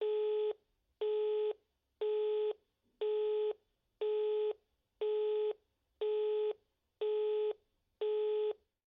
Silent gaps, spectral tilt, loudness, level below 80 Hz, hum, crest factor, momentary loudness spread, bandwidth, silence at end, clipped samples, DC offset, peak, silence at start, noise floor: none; -0.5 dB/octave; -37 LUFS; -84 dBFS; none; 10 dB; 10 LU; 4 kHz; 0.35 s; under 0.1%; under 0.1%; -28 dBFS; 0 s; -54 dBFS